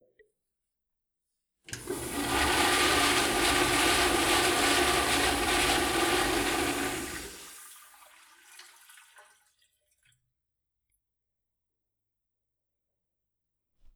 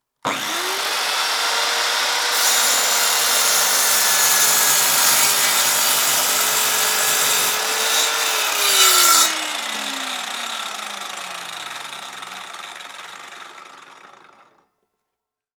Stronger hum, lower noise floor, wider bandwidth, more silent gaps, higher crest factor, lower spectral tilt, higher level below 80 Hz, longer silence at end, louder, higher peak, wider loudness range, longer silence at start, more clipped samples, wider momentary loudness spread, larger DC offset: neither; first, -86 dBFS vs -82 dBFS; about the same, over 20 kHz vs over 20 kHz; neither; about the same, 18 dB vs 20 dB; first, -2 dB/octave vs 2 dB/octave; first, -48 dBFS vs -76 dBFS; first, 5.35 s vs 1.5 s; second, -25 LUFS vs -15 LUFS; second, -12 dBFS vs 0 dBFS; second, 11 LU vs 18 LU; first, 1.7 s vs 0.25 s; neither; second, 16 LU vs 19 LU; neither